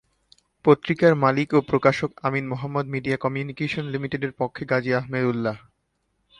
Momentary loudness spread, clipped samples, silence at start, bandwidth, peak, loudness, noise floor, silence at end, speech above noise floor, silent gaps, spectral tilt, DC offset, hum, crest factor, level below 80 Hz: 9 LU; under 0.1%; 0.65 s; 11 kHz; -4 dBFS; -23 LUFS; -73 dBFS; 0.8 s; 50 dB; none; -7.5 dB/octave; under 0.1%; none; 20 dB; -58 dBFS